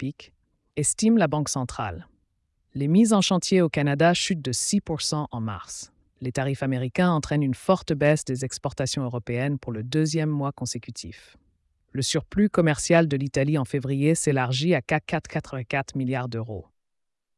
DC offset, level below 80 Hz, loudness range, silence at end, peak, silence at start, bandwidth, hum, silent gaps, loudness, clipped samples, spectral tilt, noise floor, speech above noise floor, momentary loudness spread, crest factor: under 0.1%; -54 dBFS; 5 LU; 0.75 s; -8 dBFS; 0 s; 12 kHz; none; none; -24 LUFS; under 0.1%; -5 dB/octave; -77 dBFS; 53 dB; 13 LU; 16 dB